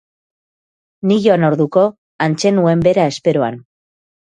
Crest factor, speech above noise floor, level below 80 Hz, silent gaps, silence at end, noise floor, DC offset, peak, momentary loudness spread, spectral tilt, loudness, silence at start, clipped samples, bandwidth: 16 dB; over 76 dB; -52 dBFS; 1.98-2.19 s; 0.75 s; under -90 dBFS; under 0.1%; 0 dBFS; 8 LU; -6.5 dB/octave; -15 LUFS; 1.05 s; under 0.1%; 9.6 kHz